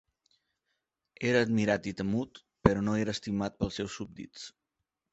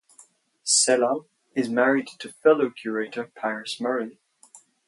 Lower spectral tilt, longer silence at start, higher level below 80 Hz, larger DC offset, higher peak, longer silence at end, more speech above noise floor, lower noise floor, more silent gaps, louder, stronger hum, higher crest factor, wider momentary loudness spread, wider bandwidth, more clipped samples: first, -6 dB/octave vs -2 dB/octave; first, 1.2 s vs 0.65 s; first, -52 dBFS vs -80 dBFS; neither; about the same, -4 dBFS vs -6 dBFS; first, 0.65 s vs 0.3 s; first, 56 dB vs 33 dB; first, -86 dBFS vs -56 dBFS; neither; second, -30 LUFS vs -24 LUFS; neither; first, 28 dB vs 18 dB; first, 17 LU vs 13 LU; second, 8.2 kHz vs 11.5 kHz; neither